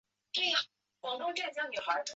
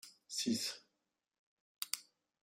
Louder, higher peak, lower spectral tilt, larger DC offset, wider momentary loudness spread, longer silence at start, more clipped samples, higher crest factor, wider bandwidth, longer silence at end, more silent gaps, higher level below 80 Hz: first, -34 LUFS vs -40 LUFS; about the same, -16 dBFS vs -18 dBFS; second, 3.5 dB/octave vs -2 dB/octave; neither; first, 12 LU vs 9 LU; first, 0.35 s vs 0.05 s; neither; second, 20 dB vs 28 dB; second, 8 kHz vs 16 kHz; second, 0 s vs 0.4 s; second, none vs 1.39-1.75 s; first, -84 dBFS vs -90 dBFS